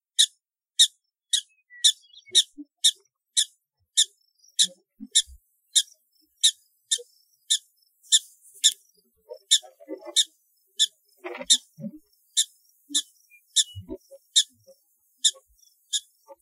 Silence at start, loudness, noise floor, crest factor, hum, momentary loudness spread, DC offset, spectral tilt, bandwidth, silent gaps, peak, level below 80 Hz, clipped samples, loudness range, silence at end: 0.2 s; -23 LUFS; -68 dBFS; 26 dB; none; 19 LU; under 0.1%; 1.5 dB/octave; 16 kHz; none; -2 dBFS; -66 dBFS; under 0.1%; 4 LU; 0.45 s